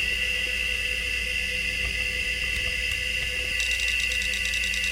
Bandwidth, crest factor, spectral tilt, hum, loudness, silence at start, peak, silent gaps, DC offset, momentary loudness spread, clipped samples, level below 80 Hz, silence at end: 17 kHz; 16 dB; -1 dB/octave; none; -24 LUFS; 0 s; -12 dBFS; none; under 0.1%; 2 LU; under 0.1%; -38 dBFS; 0 s